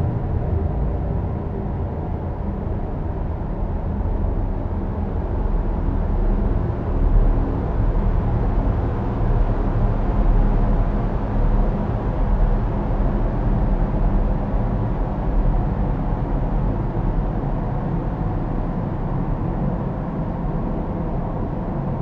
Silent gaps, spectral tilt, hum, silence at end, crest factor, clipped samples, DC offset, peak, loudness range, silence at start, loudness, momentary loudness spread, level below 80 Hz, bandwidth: none; -11 dB/octave; none; 0 s; 14 dB; under 0.1%; under 0.1%; -6 dBFS; 4 LU; 0 s; -24 LUFS; 4 LU; -22 dBFS; 3.7 kHz